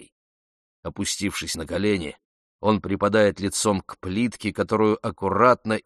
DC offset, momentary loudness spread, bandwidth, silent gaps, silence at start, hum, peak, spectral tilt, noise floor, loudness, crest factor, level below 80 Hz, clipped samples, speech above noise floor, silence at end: under 0.1%; 10 LU; 13 kHz; 0.12-0.83 s, 2.25-2.59 s; 0 s; none; -2 dBFS; -4.5 dB/octave; under -90 dBFS; -23 LUFS; 22 dB; -52 dBFS; under 0.1%; over 67 dB; 0.05 s